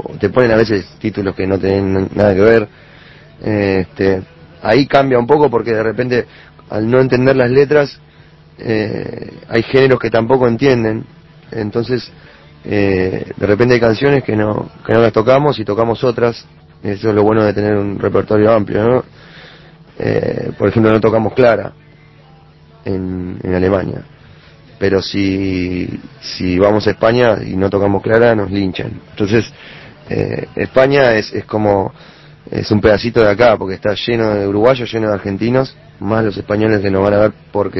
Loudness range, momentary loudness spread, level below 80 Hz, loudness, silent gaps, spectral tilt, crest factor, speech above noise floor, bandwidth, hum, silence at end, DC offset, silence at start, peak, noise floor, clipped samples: 3 LU; 12 LU; -38 dBFS; -14 LUFS; none; -7.5 dB/octave; 14 dB; 30 dB; 6.2 kHz; none; 0 s; under 0.1%; 0.05 s; 0 dBFS; -43 dBFS; 0.1%